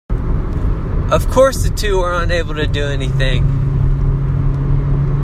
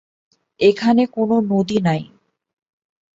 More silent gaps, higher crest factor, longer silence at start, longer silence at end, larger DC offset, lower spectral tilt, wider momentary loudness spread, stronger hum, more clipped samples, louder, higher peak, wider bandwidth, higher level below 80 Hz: neither; about the same, 14 dB vs 18 dB; second, 0.1 s vs 0.6 s; second, 0 s vs 1.1 s; neither; about the same, -6.5 dB/octave vs -7 dB/octave; about the same, 7 LU vs 5 LU; neither; neither; about the same, -17 LUFS vs -18 LUFS; about the same, 0 dBFS vs -2 dBFS; first, 15 kHz vs 7.8 kHz; first, -18 dBFS vs -60 dBFS